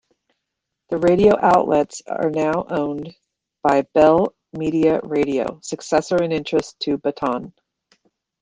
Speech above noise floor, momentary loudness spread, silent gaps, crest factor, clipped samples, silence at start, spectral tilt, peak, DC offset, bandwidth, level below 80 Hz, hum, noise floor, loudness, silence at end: 62 dB; 12 LU; none; 18 dB; under 0.1%; 0.9 s; -6 dB/octave; -2 dBFS; under 0.1%; 9.8 kHz; -52 dBFS; none; -80 dBFS; -19 LUFS; 0.9 s